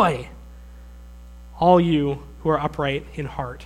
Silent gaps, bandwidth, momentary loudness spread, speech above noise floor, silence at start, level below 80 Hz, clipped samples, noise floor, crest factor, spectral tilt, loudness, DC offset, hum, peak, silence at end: none; 11 kHz; 14 LU; 20 dB; 0 s; -42 dBFS; under 0.1%; -41 dBFS; 20 dB; -7.5 dB/octave; -22 LUFS; under 0.1%; 60 Hz at -40 dBFS; -2 dBFS; 0 s